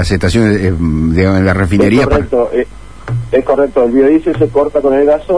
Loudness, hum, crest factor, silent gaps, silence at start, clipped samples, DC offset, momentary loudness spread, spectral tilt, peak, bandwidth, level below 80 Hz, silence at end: -11 LUFS; none; 10 dB; none; 0 s; under 0.1%; 2%; 6 LU; -7.5 dB/octave; 0 dBFS; 11 kHz; -26 dBFS; 0 s